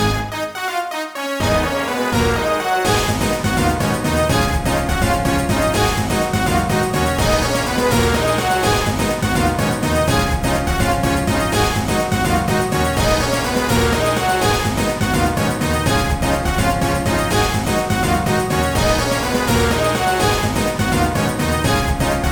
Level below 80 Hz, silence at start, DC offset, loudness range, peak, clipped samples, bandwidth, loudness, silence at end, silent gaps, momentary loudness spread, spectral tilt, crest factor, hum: -28 dBFS; 0 s; 0.5%; 1 LU; -2 dBFS; under 0.1%; 17.5 kHz; -17 LUFS; 0 s; none; 3 LU; -4.5 dB/octave; 16 dB; none